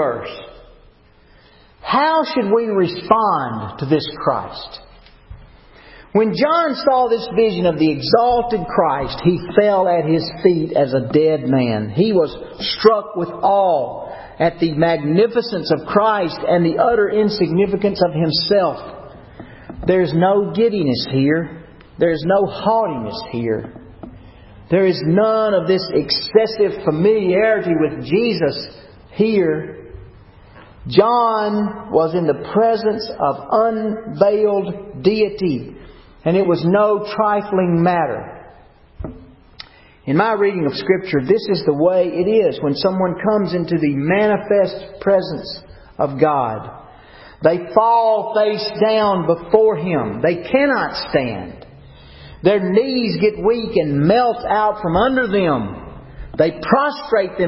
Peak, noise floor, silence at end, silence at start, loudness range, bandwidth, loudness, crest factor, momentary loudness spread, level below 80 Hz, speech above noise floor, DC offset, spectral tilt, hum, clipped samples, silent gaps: 0 dBFS; -49 dBFS; 0 s; 0 s; 3 LU; 5.8 kHz; -17 LUFS; 18 dB; 11 LU; -46 dBFS; 33 dB; under 0.1%; -10 dB/octave; none; under 0.1%; none